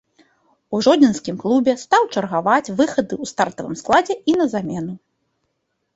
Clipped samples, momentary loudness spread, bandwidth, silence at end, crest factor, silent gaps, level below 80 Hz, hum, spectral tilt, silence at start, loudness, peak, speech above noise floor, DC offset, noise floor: under 0.1%; 11 LU; 8 kHz; 1 s; 18 dB; none; -58 dBFS; none; -5 dB/octave; 0.7 s; -19 LUFS; -2 dBFS; 55 dB; under 0.1%; -73 dBFS